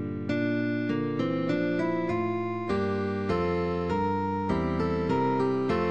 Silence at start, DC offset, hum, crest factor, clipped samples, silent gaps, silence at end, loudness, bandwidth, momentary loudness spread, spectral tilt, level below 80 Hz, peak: 0 s; 0.3%; none; 12 dB; under 0.1%; none; 0 s; -28 LUFS; 9 kHz; 3 LU; -8 dB/octave; -50 dBFS; -16 dBFS